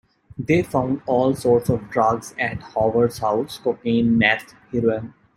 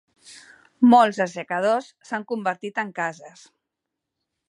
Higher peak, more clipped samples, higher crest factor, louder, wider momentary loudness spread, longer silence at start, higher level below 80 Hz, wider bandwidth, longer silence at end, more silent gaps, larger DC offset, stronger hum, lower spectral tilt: about the same, -2 dBFS vs -4 dBFS; neither; about the same, 20 dB vs 20 dB; about the same, -21 LUFS vs -22 LUFS; second, 8 LU vs 14 LU; about the same, 0.4 s vs 0.3 s; first, -50 dBFS vs -76 dBFS; first, 16 kHz vs 11 kHz; second, 0.3 s vs 1.2 s; neither; neither; neither; about the same, -6.5 dB/octave vs -5.5 dB/octave